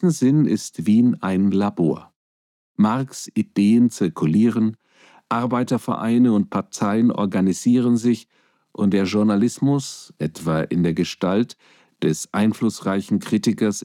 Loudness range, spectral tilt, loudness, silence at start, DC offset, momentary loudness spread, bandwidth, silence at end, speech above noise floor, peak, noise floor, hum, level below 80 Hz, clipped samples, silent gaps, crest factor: 2 LU; -6.5 dB/octave; -20 LUFS; 0 s; under 0.1%; 8 LU; 14 kHz; 0 s; over 71 dB; -6 dBFS; under -90 dBFS; none; -60 dBFS; under 0.1%; 2.16-2.75 s; 14 dB